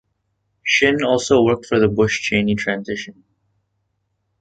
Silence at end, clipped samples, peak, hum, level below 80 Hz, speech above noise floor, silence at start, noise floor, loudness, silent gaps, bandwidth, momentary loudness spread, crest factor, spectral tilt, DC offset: 1.3 s; under 0.1%; -2 dBFS; none; -48 dBFS; 54 dB; 0.65 s; -71 dBFS; -17 LUFS; none; 9.2 kHz; 12 LU; 18 dB; -4.5 dB/octave; under 0.1%